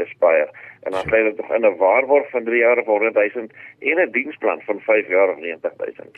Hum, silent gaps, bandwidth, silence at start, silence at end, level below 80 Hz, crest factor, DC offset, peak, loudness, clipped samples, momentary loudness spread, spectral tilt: none; none; 4.4 kHz; 0 s; 0.25 s; -58 dBFS; 16 dB; under 0.1%; -4 dBFS; -19 LUFS; under 0.1%; 11 LU; -6.5 dB/octave